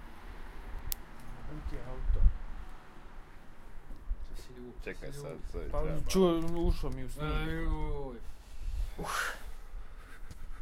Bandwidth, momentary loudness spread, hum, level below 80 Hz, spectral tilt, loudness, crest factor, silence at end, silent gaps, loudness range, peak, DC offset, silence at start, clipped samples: 16 kHz; 20 LU; none; -36 dBFS; -5.5 dB/octave; -37 LUFS; 26 dB; 0 s; none; 9 LU; -8 dBFS; under 0.1%; 0 s; under 0.1%